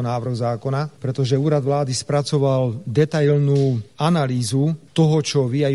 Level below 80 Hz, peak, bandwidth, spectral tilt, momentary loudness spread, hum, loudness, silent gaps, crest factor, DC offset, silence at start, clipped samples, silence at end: -56 dBFS; -4 dBFS; 12 kHz; -6.5 dB/octave; 6 LU; none; -20 LUFS; none; 14 dB; 0.2%; 0 s; under 0.1%; 0 s